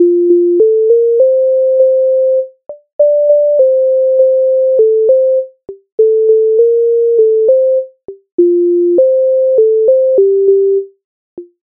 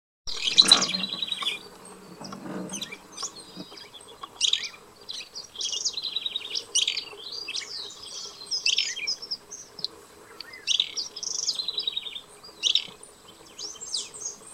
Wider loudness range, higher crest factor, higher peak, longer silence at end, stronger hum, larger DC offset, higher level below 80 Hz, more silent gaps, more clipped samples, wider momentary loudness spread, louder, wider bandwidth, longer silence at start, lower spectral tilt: second, 0 LU vs 7 LU; second, 8 dB vs 30 dB; about the same, 0 dBFS vs -2 dBFS; first, 0.25 s vs 0 s; neither; neither; about the same, -68 dBFS vs -66 dBFS; first, 2.93-2.99 s, 5.92-5.98 s, 8.32-8.38 s, 11.04-11.37 s vs none; neither; second, 6 LU vs 19 LU; first, -10 LUFS vs -26 LUFS; second, 1 kHz vs 16 kHz; second, 0 s vs 0.25 s; first, -9.5 dB/octave vs 0.5 dB/octave